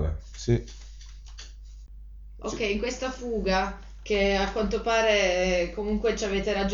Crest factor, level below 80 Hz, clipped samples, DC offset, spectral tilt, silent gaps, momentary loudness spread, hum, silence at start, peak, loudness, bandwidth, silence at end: 18 dB; -38 dBFS; under 0.1%; under 0.1%; -4.5 dB/octave; none; 23 LU; none; 0 s; -10 dBFS; -26 LUFS; 7.6 kHz; 0 s